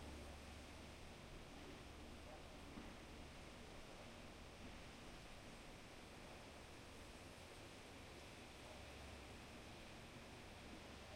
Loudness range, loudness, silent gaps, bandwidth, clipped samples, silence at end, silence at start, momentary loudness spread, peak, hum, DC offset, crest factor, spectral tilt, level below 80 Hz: 1 LU; -58 LUFS; none; 16 kHz; under 0.1%; 0 s; 0 s; 2 LU; -40 dBFS; none; under 0.1%; 16 dB; -4 dB/octave; -64 dBFS